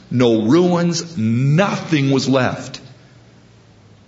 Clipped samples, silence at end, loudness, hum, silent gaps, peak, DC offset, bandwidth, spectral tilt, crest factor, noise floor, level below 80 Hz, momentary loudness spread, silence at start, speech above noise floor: under 0.1%; 1.15 s; -16 LUFS; none; none; 0 dBFS; under 0.1%; 8 kHz; -6 dB/octave; 16 dB; -47 dBFS; -56 dBFS; 10 LU; 0.1 s; 31 dB